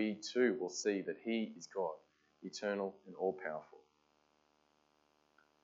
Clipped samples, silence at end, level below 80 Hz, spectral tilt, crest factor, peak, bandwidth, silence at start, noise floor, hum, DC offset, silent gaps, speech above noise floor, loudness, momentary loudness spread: under 0.1%; 1.85 s; -90 dBFS; -4 dB/octave; 20 dB; -20 dBFS; 8 kHz; 0 s; -76 dBFS; none; under 0.1%; none; 37 dB; -39 LUFS; 13 LU